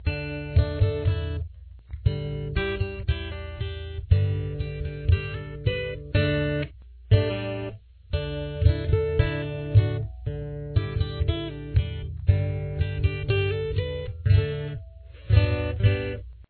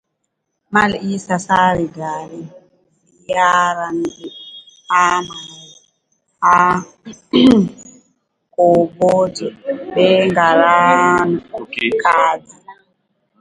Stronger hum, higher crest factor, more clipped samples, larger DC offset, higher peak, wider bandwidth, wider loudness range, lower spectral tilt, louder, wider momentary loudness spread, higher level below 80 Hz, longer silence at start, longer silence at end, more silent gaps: neither; about the same, 20 dB vs 16 dB; neither; neither; second, -6 dBFS vs 0 dBFS; second, 4.5 kHz vs 11 kHz; about the same, 3 LU vs 5 LU; first, -10.5 dB/octave vs -5 dB/octave; second, -26 LUFS vs -15 LUFS; second, 11 LU vs 18 LU; first, -32 dBFS vs -52 dBFS; second, 0 s vs 0.7 s; second, 0.05 s vs 0.7 s; neither